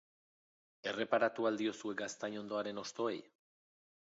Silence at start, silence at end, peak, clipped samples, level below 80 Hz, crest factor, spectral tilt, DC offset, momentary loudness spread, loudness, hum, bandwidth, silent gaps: 0.85 s; 0.8 s; -20 dBFS; under 0.1%; -86 dBFS; 20 dB; -2.5 dB/octave; under 0.1%; 9 LU; -38 LUFS; none; 7.6 kHz; none